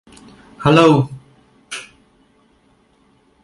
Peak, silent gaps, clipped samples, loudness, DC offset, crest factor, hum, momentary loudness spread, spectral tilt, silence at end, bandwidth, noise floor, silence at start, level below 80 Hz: 0 dBFS; none; under 0.1%; -14 LUFS; under 0.1%; 20 dB; none; 20 LU; -6.5 dB/octave; 1.6 s; 11.5 kHz; -56 dBFS; 0.6 s; -52 dBFS